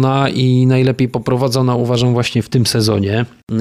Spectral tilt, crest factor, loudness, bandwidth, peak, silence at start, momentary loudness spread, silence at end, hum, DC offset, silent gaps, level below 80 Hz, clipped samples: -6 dB/octave; 10 dB; -15 LUFS; 14.5 kHz; -4 dBFS; 0 s; 5 LU; 0 s; none; under 0.1%; 3.43-3.47 s; -46 dBFS; under 0.1%